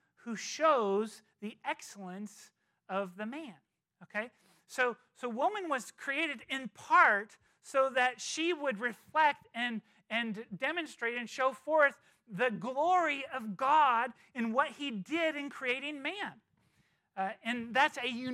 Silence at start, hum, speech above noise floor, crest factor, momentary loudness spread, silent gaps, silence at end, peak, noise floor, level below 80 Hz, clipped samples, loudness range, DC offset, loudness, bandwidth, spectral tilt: 0.25 s; none; 40 dB; 22 dB; 14 LU; none; 0 s; -12 dBFS; -73 dBFS; -86 dBFS; under 0.1%; 9 LU; under 0.1%; -33 LUFS; 15 kHz; -3.5 dB/octave